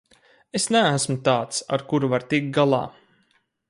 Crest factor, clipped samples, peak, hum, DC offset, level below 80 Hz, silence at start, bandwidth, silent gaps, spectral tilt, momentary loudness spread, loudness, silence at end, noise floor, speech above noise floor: 18 dB; under 0.1%; -6 dBFS; none; under 0.1%; -64 dBFS; 0.55 s; 11.5 kHz; none; -4.5 dB/octave; 7 LU; -22 LUFS; 0.8 s; -66 dBFS; 45 dB